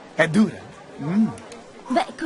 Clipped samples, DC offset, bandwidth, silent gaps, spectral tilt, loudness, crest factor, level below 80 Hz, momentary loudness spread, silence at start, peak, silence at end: under 0.1%; under 0.1%; 11.5 kHz; none; -6 dB/octave; -22 LUFS; 20 dB; -60 dBFS; 22 LU; 0 s; -2 dBFS; 0 s